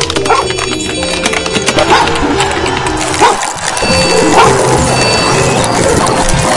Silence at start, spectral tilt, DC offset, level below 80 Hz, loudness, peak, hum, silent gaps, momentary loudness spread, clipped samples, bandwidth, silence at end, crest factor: 0 s; -3.5 dB/octave; under 0.1%; -26 dBFS; -10 LUFS; 0 dBFS; none; none; 6 LU; 0.5%; 12 kHz; 0 s; 10 dB